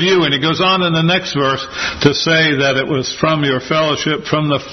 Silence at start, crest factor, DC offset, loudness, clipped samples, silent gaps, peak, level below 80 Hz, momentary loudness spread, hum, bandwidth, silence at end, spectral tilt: 0 s; 14 dB; under 0.1%; -14 LUFS; under 0.1%; none; 0 dBFS; -46 dBFS; 5 LU; none; 6.4 kHz; 0 s; -4.5 dB/octave